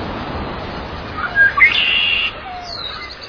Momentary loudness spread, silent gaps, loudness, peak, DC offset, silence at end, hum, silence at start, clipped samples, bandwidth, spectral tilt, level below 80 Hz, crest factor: 17 LU; none; -14 LUFS; 0 dBFS; under 0.1%; 0 s; none; 0 s; under 0.1%; 5.4 kHz; -4 dB/octave; -38 dBFS; 18 dB